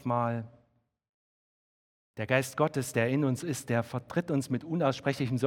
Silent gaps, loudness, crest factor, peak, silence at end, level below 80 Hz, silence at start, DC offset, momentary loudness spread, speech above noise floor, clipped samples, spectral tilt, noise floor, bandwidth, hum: 1.09-2.14 s; -31 LUFS; 22 dB; -10 dBFS; 0 s; -70 dBFS; 0 s; under 0.1%; 7 LU; 42 dB; under 0.1%; -6 dB/octave; -71 dBFS; 17 kHz; none